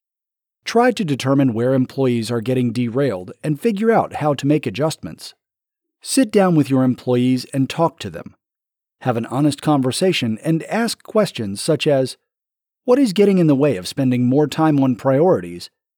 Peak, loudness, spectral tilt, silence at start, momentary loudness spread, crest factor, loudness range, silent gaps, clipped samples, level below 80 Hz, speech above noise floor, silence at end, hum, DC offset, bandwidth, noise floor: -4 dBFS; -18 LUFS; -6 dB/octave; 0.65 s; 11 LU; 14 dB; 4 LU; none; under 0.1%; -64 dBFS; 70 dB; 0.3 s; none; under 0.1%; 19 kHz; -87 dBFS